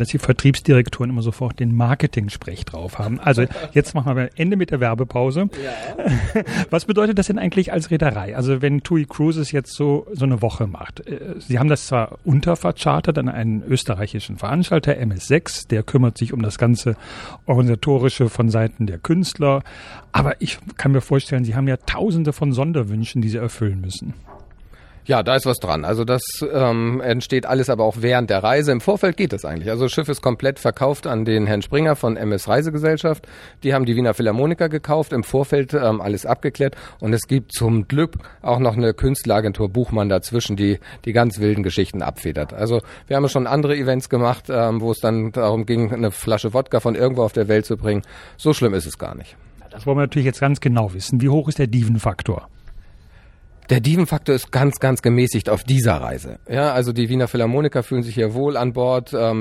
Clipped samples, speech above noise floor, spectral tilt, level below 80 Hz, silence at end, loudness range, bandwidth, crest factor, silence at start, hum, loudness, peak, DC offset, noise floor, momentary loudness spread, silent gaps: under 0.1%; 27 dB; -6.5 dB/octave; -40 dBFS; 0 s; 2 LU; 14.5 kHz; 18 dB; 0 s; none; -19 LUFS; -2 dBFS; under 0.1%; -46 dBFS; 8 LU; none